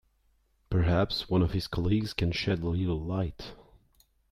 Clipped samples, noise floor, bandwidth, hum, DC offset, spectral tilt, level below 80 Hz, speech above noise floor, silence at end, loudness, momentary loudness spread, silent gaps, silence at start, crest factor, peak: under 0.1%; -69 dBFS; 13.5 kHz; none; under 0.1%; -7 dB/octave; -44 dBFS; 41 dB; 0.7 s; -29 LUFS; 7 LU; none; 0.7 s; 18 dB; -12 dBFS